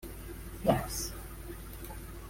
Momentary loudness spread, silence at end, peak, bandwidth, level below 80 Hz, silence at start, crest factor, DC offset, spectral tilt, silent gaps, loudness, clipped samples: 14 LU; 0 s; -12 dBFS; 16.5 kHz; -46 dBFS; 0 s; 24 dB; under 0.1%; -5 dB/octave; none; -36 LUFS; under 0.1%